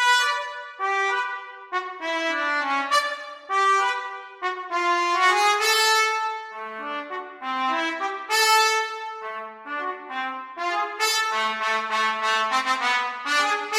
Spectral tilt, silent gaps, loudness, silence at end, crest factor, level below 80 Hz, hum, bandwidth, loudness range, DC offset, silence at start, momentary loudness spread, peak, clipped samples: 1 dB/octave; none; -23 LUFS; 0 s; 18 dB; -80 dBFS; none; 16 kHz; 4 LU; under 0.1%; 0 s; 14 LU; -6 dBFS; under 0.1%